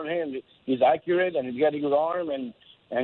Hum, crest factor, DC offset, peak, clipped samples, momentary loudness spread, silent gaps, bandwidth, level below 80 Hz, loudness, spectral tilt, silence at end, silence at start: none; 16 dB; under 0.1%; -10 dBFS; under 0.1%; 12 LU; none; 4.3 kHz; -70 dBFS; -26 LUFS; -9.5 dB/octave; 0 s; 0 s